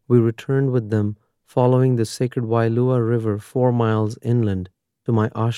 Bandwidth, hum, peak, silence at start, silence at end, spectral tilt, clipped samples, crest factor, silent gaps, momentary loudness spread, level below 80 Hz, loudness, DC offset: 12 kHz; none; -4 dBFS; 0.1 s; 0 s; -8 dB/octave; under 0.1%; 16 dB; none; 8 LU; -62 dBFS; -20 LUFS; under 0.1%